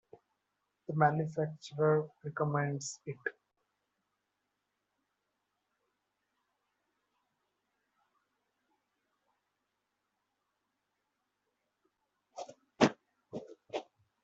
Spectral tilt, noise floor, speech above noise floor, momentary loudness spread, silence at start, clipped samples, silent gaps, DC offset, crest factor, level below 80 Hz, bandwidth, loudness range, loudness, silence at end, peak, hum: -5.5 dB/octave; -85 dBFS; 51 dB; 19 LU; 0.9 s; under 0.1%; none; under 0.1%; 30 dB; -78 dBFS; 7.6 kHz; 16 LU; -34 LUFS; 0.4 s; -10 dBFS; 50 Hz at -95 dBFS